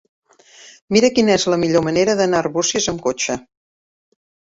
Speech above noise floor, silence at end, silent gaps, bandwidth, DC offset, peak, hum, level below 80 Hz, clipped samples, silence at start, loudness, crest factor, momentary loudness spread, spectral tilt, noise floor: 29 dB; 1.1 s; 0.82-0.88 s; 8 kHz; under 0.1%; -2 dBFS; none; -52 dBFS; under 0.1%; 0.65 s; -17 LUFS; 16 dB; 7 LU; -4 dB/octave; -46 dBFS